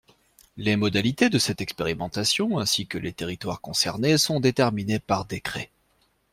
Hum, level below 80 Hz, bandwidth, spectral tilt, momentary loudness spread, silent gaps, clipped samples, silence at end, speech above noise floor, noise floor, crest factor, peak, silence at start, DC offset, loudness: none; -54 dBFS; 16.5 kHz; -4 dB/octave; 11 LU; none; under 0.1%; 0.65 s; 42 dB; -67 dBFS; 20 dB; -6 dBFS; 0.55 s; under 0.1%; -24 LUFS